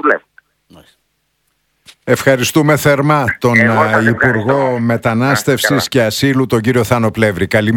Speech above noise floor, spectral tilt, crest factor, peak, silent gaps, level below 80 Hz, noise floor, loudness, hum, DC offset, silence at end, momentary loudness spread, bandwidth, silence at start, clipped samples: 52 dB; -5.5 dB/octave; 14 dB; 0 dBFS; none; -46 dBFS; -64 dBFS; -12 LUFS; none; under 0.1%; 0 s; 4 LU; 18.5 kHz; 0.05 s; 0.2%